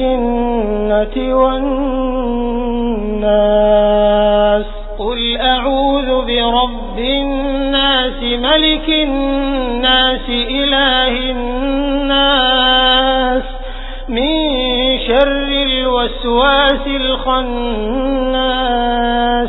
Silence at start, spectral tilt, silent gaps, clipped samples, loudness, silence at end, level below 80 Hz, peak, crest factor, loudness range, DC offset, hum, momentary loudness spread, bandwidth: 0 s; -7.5 dB/octave; none; under 0.1%; -14 LUFS; 0 s; -24 dBFS; 0 dBFS; 14 dB; 2 LU; 0.2%; none; 7 LU; 4.1 kHz